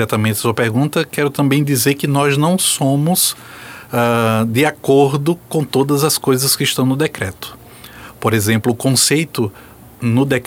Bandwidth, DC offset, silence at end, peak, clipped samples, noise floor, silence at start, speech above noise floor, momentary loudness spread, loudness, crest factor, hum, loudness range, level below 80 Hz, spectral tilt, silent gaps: 17 kHz; under 0.1%; 0 s; -2 dBFS; under 0.1%; -37 dBFS; 0 s; 21 dB; 10 LU; -15 LUFS; 14 dB; none; 2 LU; -52 dBFS; -4.5 dB/octave; none